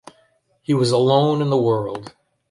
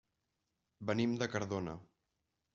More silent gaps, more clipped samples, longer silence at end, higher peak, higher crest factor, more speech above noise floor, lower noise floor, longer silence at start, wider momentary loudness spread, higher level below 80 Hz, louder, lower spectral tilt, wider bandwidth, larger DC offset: neither; neither; second, 0.4 s vs 0.7 s; first, -2 dBFS vs -20 dBFS; about the same, 18 dB vs 22 dB; second, 43 dB vs 49 dB; second, -61 dBFS vs -86 dBFS; about the same, 0.7 s vs 0.8 s; first, 15 LU vs 11 LU; first, -60 dBFS vs -72 dBFS; first, -18 LUFS vs -38 LUFS; first, -7 dB/octave vs -5.5 dB/octave; first, 11.5 kHz vs 7.4 kHz; neither